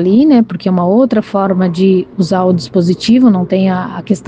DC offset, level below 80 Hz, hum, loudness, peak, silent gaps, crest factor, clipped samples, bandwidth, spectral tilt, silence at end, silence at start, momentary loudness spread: under 0.1%; -50 dBFS; none; -11 LUFS; 0 dBFS; none; 10 dB; under 0.1%; 9 kHz; -7.5 dB/octave; 0.05 s; 0 s; 6 LU